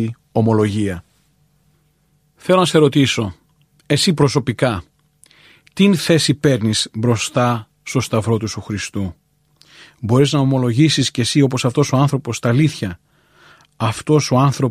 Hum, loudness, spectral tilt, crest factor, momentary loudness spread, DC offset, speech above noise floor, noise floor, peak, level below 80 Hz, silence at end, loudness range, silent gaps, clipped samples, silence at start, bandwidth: none; -17 LUFS; -5.5 dB/octave; 16 dB; 11 LU; under 0.1%; 44 dB; -60 dBFS; -2 dBFS; -50 dBFS; 0 s; 3 LU; none; under 0.1%; 0 s; 14.5 kHz